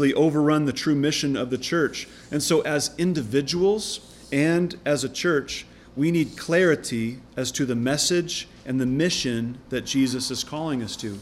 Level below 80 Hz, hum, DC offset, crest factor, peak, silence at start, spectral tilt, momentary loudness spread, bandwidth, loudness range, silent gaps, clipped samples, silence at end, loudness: -54 dBFS; none; under 0.1%; 16 dB; -8 dBFS; 0 s; -4.5 dB/octave; 9 LU; 16 kHz; 1 LU; none; under 0.1%; 0 s; -24 LUFS